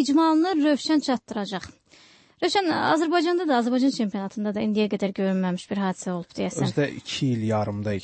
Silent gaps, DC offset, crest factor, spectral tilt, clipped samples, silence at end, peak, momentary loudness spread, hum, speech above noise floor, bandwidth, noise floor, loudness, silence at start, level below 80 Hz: none; under 0.1%; 16 dB; -5.5 dB/octave; under 0.1%; 0 s; -8 dBFS; 9 LU; none; 31 dB; 8.8 kHz; -54 dBFS; -24 LUFS; 0 s; -62 dBFS